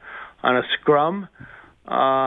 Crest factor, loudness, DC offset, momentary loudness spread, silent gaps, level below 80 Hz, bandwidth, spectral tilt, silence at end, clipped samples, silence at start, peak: 18 dB; -21 LUFS; under 0.1%; 16 LU; none; -60 dBFS; 4 kHz; -8 dB/octave; 0 s; under 0.1%; 0.05 s; -4 dBFS